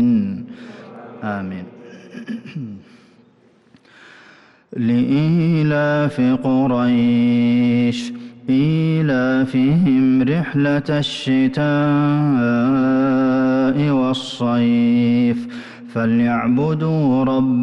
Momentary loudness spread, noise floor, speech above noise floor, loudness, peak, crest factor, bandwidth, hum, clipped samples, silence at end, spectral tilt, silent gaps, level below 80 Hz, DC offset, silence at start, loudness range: 15 LU; -53 dBFS; 37 dB; -17 LUFS; -8 dBFS; 8 dB; 8.4 kHz; none; under 0.1%; 0 s; -8 dB/octave; none; -52 dBFS; under 0.1%; 0 s; 15 LU